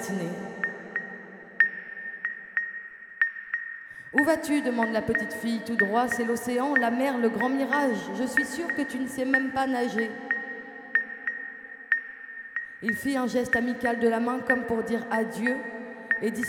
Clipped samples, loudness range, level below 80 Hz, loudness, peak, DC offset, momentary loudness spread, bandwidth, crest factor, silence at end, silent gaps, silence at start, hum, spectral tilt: under 0.1%; 4 LU; -64 dBFS; -27 LUFS; -6 dBFS; under 0.1%; 12 LU; 17.5 kHz; 22 dB; 0 s; none; 0 s; none; -4.5 dB/octave